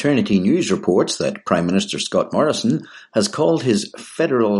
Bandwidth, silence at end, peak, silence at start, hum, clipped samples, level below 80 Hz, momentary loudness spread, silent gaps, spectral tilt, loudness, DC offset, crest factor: 11.5 kHz; 0 s; -2 dBFS; 0 s; none; under 0.1%; -58 dBFS; 6 LU; none; -5 dB/octave; -19 LUFS; under 0.1%; 16 dB